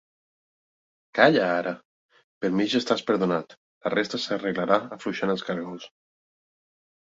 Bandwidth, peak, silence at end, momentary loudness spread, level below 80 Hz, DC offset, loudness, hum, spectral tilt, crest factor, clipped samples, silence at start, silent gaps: 7.8 kHz; -2 dBFS; 1.15 s; 13 LU; -68 dBFS; under 0.1%; -25 LUFS; none; -5.5 dB/octave; 24 dB; under 0.1%; 1.15 s; 1.85-2.09 s, 2.24-2.41 s, 3.57-3.81 s